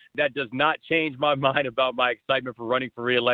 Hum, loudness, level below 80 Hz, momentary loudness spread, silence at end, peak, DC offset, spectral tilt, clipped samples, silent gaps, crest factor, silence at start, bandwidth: none; -24 LUFS; -64 dBFS; 4 LU; 0 s; -6 dBFS; under 0.1%; -7.5 dB/octave; under 0.1%; none; 20 dB; 0.15 s; 4.8 kHz